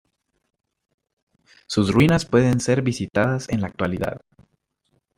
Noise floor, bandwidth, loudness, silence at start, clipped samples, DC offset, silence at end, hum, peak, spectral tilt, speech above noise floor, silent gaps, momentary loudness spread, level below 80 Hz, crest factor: -71 dBFS; 15.5 kHz; -21 LUFS; 1.7 s; under 0.1%; under 0.1%; 1 s; none; -4 dBFS; -6 dB/octave; 50 dB; none; 10 LU; -48 dBFS; 20 dB